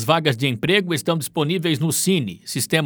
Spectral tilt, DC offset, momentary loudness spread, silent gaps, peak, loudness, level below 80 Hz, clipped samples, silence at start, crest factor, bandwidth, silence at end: -4 dB/octave; under 0.1%; 4 LU; none; -2 dBFS; -20 LUFS; -60 dBFS; under 0.1%; 0 s; 18 dB; over 20 kHz; 0 s